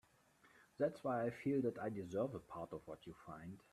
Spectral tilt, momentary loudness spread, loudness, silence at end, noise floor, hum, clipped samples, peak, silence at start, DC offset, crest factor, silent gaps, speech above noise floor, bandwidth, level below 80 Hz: -8 dB/octave; 15 LU; -43 LUFS; 0.15 s; -72 dBFS; none; under 0.1%; -26 dBFS; 0.55 s; under 0.1%; 18 dB; none; 29 dB; 13.5 kHz; -76 dBFS